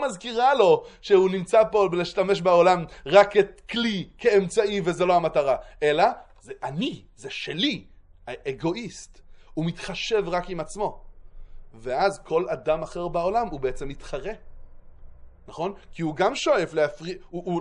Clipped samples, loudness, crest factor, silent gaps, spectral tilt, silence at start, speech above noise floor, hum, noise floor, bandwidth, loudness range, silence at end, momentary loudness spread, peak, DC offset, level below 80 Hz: under 0.1%; -24 LUFS; 22 dB; none; -5 dB/octave; 0 s; 20 dB; none; -44 dBFS; 11 kHz; 10 LU; 0 s; 16 LU; -2 dBFS; under 0.1%; -50 dBFS